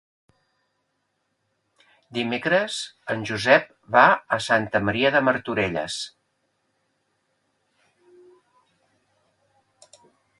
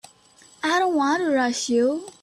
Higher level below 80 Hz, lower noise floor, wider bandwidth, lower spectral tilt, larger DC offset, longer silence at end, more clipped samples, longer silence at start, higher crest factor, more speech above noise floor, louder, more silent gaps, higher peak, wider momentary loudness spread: first, -60 dBFS vs -68 dBFS; first, -74 dBFS vs -53 dBFS; second, 11.5 kHz vs 13.5 kHz; first, -4 dB/octave vs -2.5 dB/octave; neither; first, 4.3 s vs 0.15 s; neither; first, 2.1 s vs 0.65 s; first, 24 dB vs 12 dB; first, 52 dB vs 32 dB; about the same, -22 LUFS vs -22 LUFS; neither; first, -2 dBFS vs -10 dBFS; first, 13 LU vs 3 LU